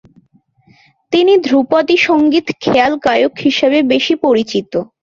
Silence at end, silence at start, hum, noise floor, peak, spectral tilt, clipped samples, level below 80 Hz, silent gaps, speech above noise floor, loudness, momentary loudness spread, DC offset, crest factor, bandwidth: 0.2 s; 1.1 s; none; -53 dBFS; 0 dBFS; -5 dB/octave; under 0.1%; -54 dBFS; none; 41 dB; -13 LUFS; 5 LU; under 0.1%; 12 dB; 7.4 kHz